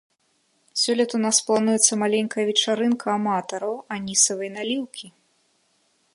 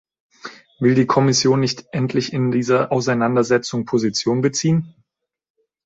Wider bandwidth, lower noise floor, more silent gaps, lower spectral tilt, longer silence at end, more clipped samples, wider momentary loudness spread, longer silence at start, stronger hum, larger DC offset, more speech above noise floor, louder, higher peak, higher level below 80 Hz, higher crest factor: first, 11.5 kHz vs 8 kHz; second, -67 dBFS vs -75 dBFS; neither; second, -2 dB/octave vs -5 dB/octave; about the same, 1.05 s vs 0.95 s; neither; about the same, 11 LU vs 12 LU; first, 0.75 s vs 0.45 s; neither; neither; second, 45 dB vs 57 dB; second, -22 LUFS vs -18 LUFS; about the same, -2 dBFS vs -2 dBFS; second, -70 dBFS vs -58 dBFS; first, 22 dB vs 16 dB